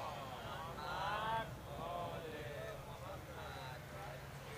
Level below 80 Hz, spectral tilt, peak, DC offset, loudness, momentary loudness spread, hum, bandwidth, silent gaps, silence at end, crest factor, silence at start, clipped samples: -60 dBFS; -4.5 dB/octave; -28 dBFS; under 0.1%; -46 LUFS; 9 LU; none; 15.5 kHz; none; 0 s; 18 dB; 0 s; under 0.1%